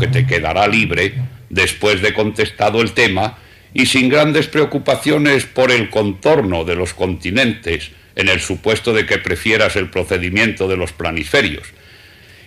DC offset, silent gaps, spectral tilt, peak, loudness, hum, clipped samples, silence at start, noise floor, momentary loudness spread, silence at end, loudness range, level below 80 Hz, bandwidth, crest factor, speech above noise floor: under 0.1%; none; -4.5 dB/octave; -2 dBFS; -15 LUFS; none; under 0.1%; 0 s; -42 dBFS; 7 LU; 0.75 s; 2 LU; -40 dBFS; 16 kHz; 14 dB; 27 dB